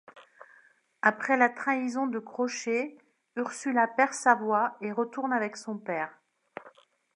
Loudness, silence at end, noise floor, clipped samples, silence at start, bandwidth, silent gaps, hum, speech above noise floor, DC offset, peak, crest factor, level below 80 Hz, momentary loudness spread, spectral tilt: -28 LUFS; 0.45 s; -62 dBFS; under 0.1%; 0.15 s; 11.5 kHz; none; none; 34 dB; under 0.1%; -6 dBFS; 24 dB; -86 dBFS; 14 LU; -4 dB/octave